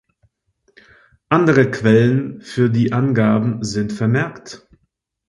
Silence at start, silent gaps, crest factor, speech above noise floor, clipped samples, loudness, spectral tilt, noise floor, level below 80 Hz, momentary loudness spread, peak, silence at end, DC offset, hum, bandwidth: 1.3 s; none; 18 dB; 54 dB; under 0.1%; -17 LUFS; -7.5 dB/octave; -70 dBFS; -52 dBFS; 11 LU; 0 dBFS; 0.75 s; under 0.1%; none; 11 kHz